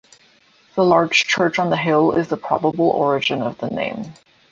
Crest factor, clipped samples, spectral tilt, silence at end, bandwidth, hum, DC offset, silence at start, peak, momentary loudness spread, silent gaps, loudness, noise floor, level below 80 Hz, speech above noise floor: 16 dB; under 0.1%; -5 dB/octave; 0.4 s; 7.8 kHz; none; under 0.1%; 0.75 s; -2 dBFS; 10 LU; none; -18 LUFS; -55 dBFS; -58 dBFS; 36 dB